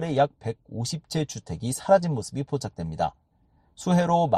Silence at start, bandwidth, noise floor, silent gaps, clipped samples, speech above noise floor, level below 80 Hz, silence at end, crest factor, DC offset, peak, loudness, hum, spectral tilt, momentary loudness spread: 0 s; 13 kHz; -64 dBFS; none; under 0.1%; 38 dB; -54 dBFS; 0 s; 20 dB; under 0.1%; -6 dBFS; -27 LUFS; none; -6 dB/octave; 12 LU